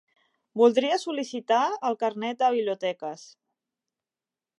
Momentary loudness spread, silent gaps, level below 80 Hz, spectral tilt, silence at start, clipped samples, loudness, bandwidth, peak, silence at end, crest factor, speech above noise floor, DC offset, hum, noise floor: 15 LU; none; -86 dBFS; -4 dB/octave; 0.55 s; under 0.1%; -25 LUFS; 11 kHz; -6 dBFS; 1.35 s; 20 dB; over 65 dB; under 0.1%; none; under -90 dBFS